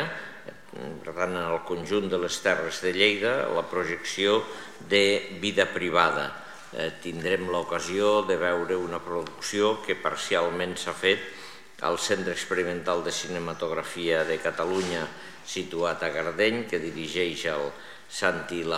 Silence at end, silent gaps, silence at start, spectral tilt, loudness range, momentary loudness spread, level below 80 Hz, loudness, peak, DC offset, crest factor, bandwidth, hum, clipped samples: 0 s; none; 0 s; -3.5 dB/octave; 4 LU; 13 LU; -62 dBFS; -27 LUFS; -6 dBFS; 0.4%; 22 dB; 15.5 kHz; none; under 0.1%